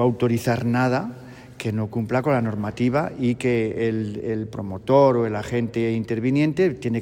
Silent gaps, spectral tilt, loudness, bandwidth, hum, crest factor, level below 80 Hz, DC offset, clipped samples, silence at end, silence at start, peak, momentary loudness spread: none; -7.5 dB/octave; -22 LUFS; 16 kHz; none; 18 dB; -52 dBFS; under 0.1%; under 0.1%; 0 s; 0 s; -4 dBFS; 9 LU